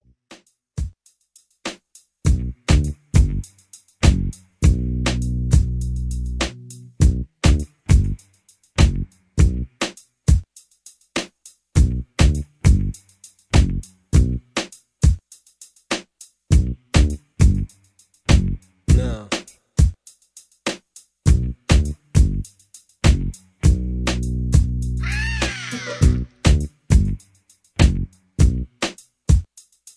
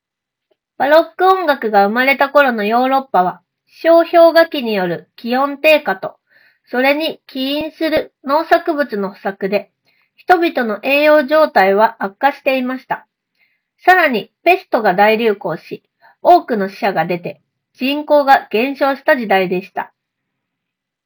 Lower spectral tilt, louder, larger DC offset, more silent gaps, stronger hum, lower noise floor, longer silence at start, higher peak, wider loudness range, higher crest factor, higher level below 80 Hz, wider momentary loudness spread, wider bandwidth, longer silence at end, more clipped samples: about the same, -5.5 dB/octave vs -6 dB/octave; second, -21 LUFS vs -14 LUFS; neither; neither; neither; second, -57 dBFS vs -81 dBFS; second, 0.3 s vs 0.8 s; about the same, 0 dBFS vs 0 dBFS; about the same, 2 LU vs 4 LU; about the same, 18 dB vs 16 dB; first, -22 dBFS vs -60 dBFS; about the same, 12 LU vs 12 LU; second, 11 kHz vs over 20 kHz; second, 0.55 s vs 1.2 s; second, under 0.1% vs 0.1%